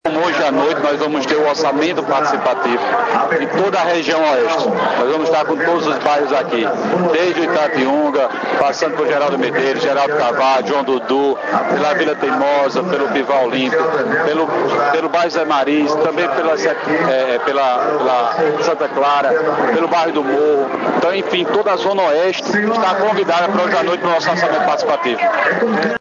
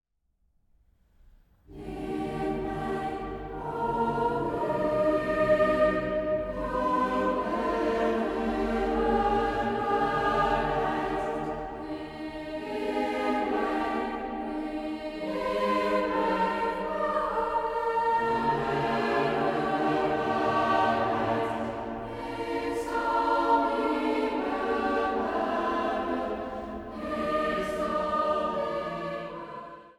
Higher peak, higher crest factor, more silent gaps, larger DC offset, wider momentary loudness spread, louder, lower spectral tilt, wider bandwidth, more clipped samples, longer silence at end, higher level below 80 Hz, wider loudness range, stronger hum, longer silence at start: first, 0 dBFS vs -12 dBFS; about the same, 16 dB vs 16 dB; neither; neither; second, 2 LU vs 10 LU; first, -15 LUFS vs -28 LUFS; second, -4.5 dB/octave vs -6.5 dB/octave; second, 7.6 kHz vs 16.5 kHz; neither; about the same, 0.05 s vs 0.05 s; second, -66 dBFS vs -48 dBFS; second, 1 LU vs 5 LU; neither; second, 0.05 s vs 1.7 s